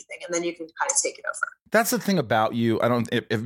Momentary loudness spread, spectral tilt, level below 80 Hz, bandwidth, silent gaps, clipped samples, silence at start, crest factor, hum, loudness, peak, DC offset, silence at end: 7 LU; -4 dB/octave; -68 dBFS; 17 kHz; 1.61-1.66 s; under 0.1%; 0.1 s; 18 dB; none; -24 LUFS; -6 dBFS; under 0.1%; 0 s